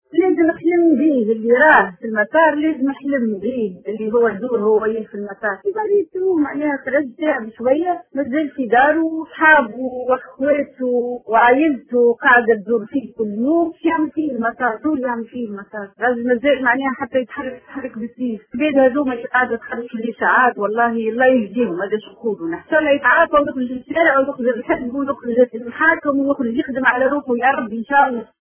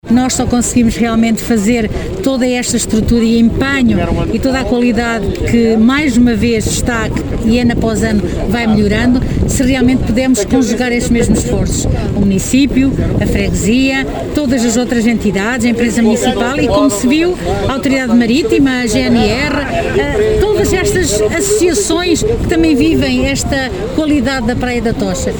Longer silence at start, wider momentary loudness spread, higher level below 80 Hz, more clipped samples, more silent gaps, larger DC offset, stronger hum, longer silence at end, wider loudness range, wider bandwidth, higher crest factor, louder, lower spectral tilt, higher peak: about the same, 0.15 s vs 0.05 s; first, 11 LU vs 4 LU; second, -56 dBFS vs -24 dBFS; neither; neither; second, under 0.1% vs 0.2%; neither; first, 0.25 s vs 0 s; first, 4 LU vs 1 LU; second, 3.5 kHz vs over 20 kHz; first, 18 dB vs 12 dB; second, -17 LUFS vs -12 LUFS; first, -9 dB/octave vs -5 dB/octave; about the same, 0 dBFS vs 0 dBFS